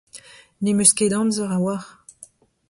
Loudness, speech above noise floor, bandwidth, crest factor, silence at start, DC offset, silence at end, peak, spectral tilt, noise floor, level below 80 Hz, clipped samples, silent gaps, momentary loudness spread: -19 LUFS; 30 dB; 11.5 kHz; 22 dB; 0.15 s; under 0.1%; 0.45 s; -2 dBFS; -4 dB/octave; -49 dBFS; -60 dBFS; under 0.1%; none; 11 LU